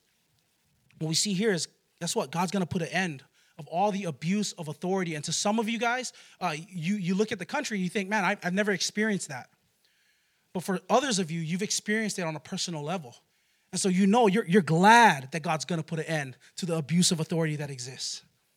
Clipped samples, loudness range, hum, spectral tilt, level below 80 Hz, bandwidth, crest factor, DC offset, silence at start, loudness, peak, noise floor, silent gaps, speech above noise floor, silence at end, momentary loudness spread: under 0.1%; 7 LU; none; -4 dB/octave; -76 dBFS; 16 kHz; 24 dB; under 0.1%; 1 s; -27 LUFS; -4 dBFS; -71 dBFS; none; 43 dB; 0.35 s; 13 LU